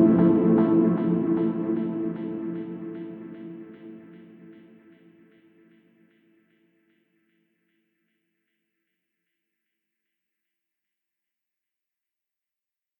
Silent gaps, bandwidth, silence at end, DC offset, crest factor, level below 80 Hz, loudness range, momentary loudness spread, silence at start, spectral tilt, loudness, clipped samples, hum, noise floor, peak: none; 3.5 kHz; 8.45 s; under 0.1%; 20 dB; -64 dBFS; 24 LU; 23 LU; 0 s; -12.5 dB/octave; -24 LUFS; under 0.1%; none; -90 dBFS; -8 dBFS